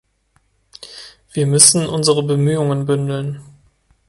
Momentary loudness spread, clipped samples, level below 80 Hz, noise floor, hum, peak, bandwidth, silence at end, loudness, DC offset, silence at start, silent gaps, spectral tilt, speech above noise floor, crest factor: 25 LU; under 0.1%; -54 dBFS; -61 dBFS; none; 0 dBFS; 16 kHz; 0.65 s; -14 LUFS; under 0.1%; 0.8 s; none; -4 dB/octave; 46 dB; 18 dB